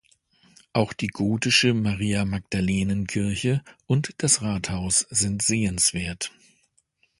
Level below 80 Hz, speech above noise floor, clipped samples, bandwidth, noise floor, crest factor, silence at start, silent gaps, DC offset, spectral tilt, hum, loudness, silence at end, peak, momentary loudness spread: -46 dBFS; 43 dB; under 0.1%; 11.5 kHz; -67 dBFS; 20 dB; 0.75 s; none; under 0.1%; -3.5 dB/octave; none; -23 LUFS; 0.9 s; -6 dBFS; 9 LU